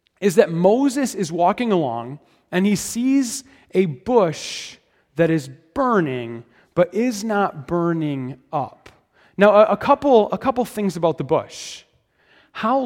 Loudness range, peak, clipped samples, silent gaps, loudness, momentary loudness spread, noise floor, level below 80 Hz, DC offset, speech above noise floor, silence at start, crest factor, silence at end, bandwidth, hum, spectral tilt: 4 LU; 0 dBFS; under 0.1%; none; -20 LUFS; 16 LU; -60 dBFS; -56 dBFS; under 0.1%; 40 dB; 0.2 s; 20 dB; 0 s; 16.5 kHz; none; -5.5 dB/octave